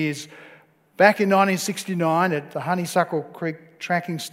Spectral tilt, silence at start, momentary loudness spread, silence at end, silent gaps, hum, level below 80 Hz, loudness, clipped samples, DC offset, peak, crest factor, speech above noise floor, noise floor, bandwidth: -5 dB/octave; 0 s; 13 LU; 0.05 s; none; none; -74 dBFS; -22 LUFS; under 0.1%; under 0.1%; 0 dBFS; 22 dB; 31 dB; -53 dBFS; 16 kHz